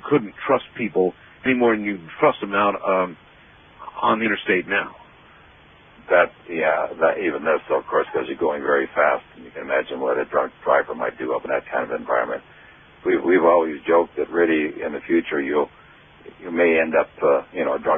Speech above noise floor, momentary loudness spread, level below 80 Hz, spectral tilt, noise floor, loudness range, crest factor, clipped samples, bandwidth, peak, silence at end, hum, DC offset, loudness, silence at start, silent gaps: 29 dB; 8 LU; -60 dBFS; -3.5 dB/octave; -50 dBFS; 3 LU; 18 dB; under 0.1%; 3.7 kHz; -2 dBFS; 0 s; none; under 0.1%; -21 LUFS; 0.05 s; none